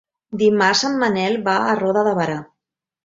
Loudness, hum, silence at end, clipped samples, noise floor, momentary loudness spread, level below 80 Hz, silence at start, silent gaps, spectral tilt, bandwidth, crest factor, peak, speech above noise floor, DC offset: -18 LUFS; none; 0.6 s; under 0.1%; -82 dBFS; 8 LU; -62 dBFS; 0.3 s; none; -4 dB/octave; 7.8 kHz; 18 dB; -2 dBFS; 64 dB; under 0.1%